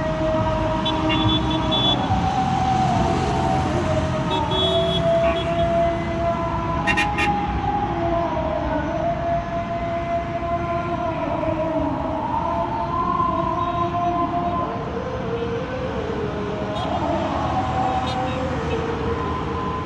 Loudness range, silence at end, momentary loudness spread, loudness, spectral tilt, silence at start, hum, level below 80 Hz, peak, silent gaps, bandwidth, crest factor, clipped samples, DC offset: 4 LU; 0 s; 6 LU; -22 LUFS; -6 dB/octave; 0 s; none; -36 dBFS; -6 dBFS; none; 11.5 kHz; 16 dB; under 0.1%; under 0.1%